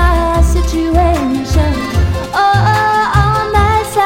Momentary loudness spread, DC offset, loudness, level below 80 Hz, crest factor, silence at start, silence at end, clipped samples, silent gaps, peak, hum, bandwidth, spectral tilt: 4 LU; under 0.1%; -12 LUFS; -16 dBFS; 12 dB; 0 s; 0 s; under 0.1%; none; 0 dBFS; none; 16.5 kHz; -6 dB/octave